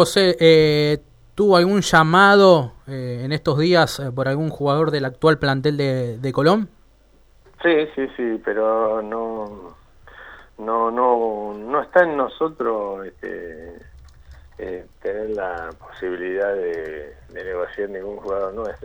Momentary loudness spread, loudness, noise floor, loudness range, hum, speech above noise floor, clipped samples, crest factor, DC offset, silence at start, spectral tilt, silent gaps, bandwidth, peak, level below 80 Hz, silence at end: 18 LU; -19 LUFS; -53 dBFS; 12 LU; none; 33 dB; under 0.1%; 18 dB; under 0.1%; 0 s; -5.5 dB/octave; none; 15.5 kHz; -2 dBFS; -48 dBFS; 0 s